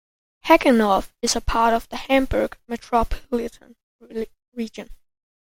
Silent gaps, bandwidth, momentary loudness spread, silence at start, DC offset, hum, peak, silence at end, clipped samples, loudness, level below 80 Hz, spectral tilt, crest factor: 3.83-3.99 s, 4.48-4.52 s; 16.5 kHz; 17 LU; 0.45 s; under 0.1%; none; -2 dBFS; 0.5 s; under 0.1%; -21 LUFS; -36 dBFS; -4 dB/octave; 22 dB